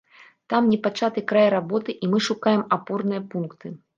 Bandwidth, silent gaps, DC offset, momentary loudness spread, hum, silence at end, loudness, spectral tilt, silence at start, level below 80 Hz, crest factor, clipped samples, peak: 7.6 kHz; none; under 0.1%; 11 LU; none; 0.2 s; -23 LUFS; -6 dB/octave; 0.5 s; -70 dBFS; 18 dB; under 0.1%; -6 dBFS